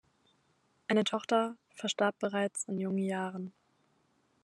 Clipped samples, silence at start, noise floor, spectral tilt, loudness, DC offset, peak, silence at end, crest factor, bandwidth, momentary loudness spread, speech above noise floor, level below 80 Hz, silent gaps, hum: under 0.1%; 0.9 s; -73 dBFS; -4.5 dB/octave; -33 LUFS; under 0.1%; -14 dBFS; 0.95 s; 22 dB; 12 kHz; 10 LU; 40 dB; -86 dBFS; none; none